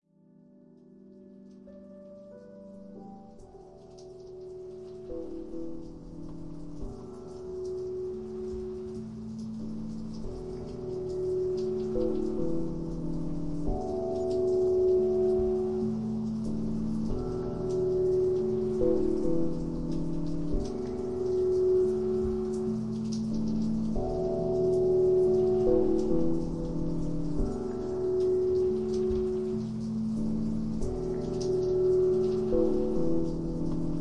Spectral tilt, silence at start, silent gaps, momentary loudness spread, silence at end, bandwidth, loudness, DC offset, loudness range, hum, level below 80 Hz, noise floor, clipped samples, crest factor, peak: -9 dB/octave; 0 s; none; 18 LU; 0 s; 8.8 kHz; -30 LUFS; 0.4%; 16 LU; none; -44 dBFS; -59 dBFS; under 0.1%; 16 dB; -14 dBFS